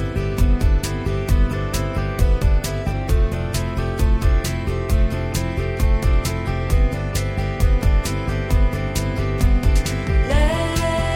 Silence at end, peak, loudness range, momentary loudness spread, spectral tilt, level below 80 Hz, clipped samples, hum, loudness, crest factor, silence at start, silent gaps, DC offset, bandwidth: 0 s; -4 dBFS; 1 LU; 5 LU; -6 dB/octave; -20 dBFS; under 0.1%; none; -21 LUFS; 12 dB; 0 s; none; under 0.1%; 16.5 kHz